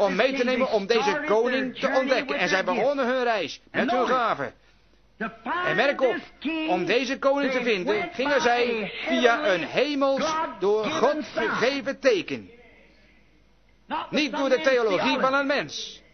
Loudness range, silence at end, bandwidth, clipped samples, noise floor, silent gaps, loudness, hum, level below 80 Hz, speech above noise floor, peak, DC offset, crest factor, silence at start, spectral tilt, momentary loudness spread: 3 LU; 0.15 s; 6.6 kHz; under 0.1%; -60 dBFS; none; -24 LUFS; none; -62 dBFS; 36 dB; -6 dBFS; under 0.1%; 20 dB; 0 s; -4 dB/octave; 8 LU